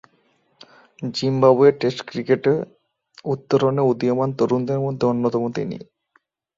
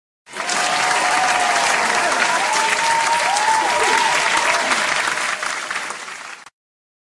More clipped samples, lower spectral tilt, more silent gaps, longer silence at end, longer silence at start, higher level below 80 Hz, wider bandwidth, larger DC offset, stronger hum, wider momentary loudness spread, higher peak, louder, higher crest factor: neither; first, -7.5 dB/octave vs 0 dB/octave; neither; about the same, 0.75 s vs 0.7 s; first, 1 s vs 0.3 s; about the same, -62 dBFS vs -60 dBFS; second, 7.6 kHz vs 12 kHz; neither; neither; about the same, 13 LU vs 11 LU; about the same, -2 dBFS vs -2 dBFS; second, -20 LUFS vs -17 LUFS; about the same, 18 dB vs 16 dB